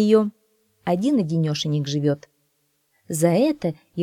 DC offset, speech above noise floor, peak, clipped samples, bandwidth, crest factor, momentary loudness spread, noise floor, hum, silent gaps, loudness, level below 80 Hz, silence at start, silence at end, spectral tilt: under 0.1%; 48 dB; -4 dBFS; under 0.1%; 16 kHz; 18 dB; 10 LU; -69 dBFS; none; none; -22 LUFS; -66 dBFS; 0 s; 0 s; -6.5 dB/octave